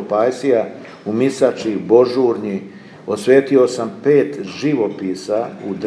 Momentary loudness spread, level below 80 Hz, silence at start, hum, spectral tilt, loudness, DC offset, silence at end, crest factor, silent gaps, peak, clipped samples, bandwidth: 12 LU; -68 dBFS; 0 s; none; -6 dB/octave; -17 LUFS; under 0.1%; 0 s; 16 dB; none; 0 dBFS; under 0.1%; 11 kHz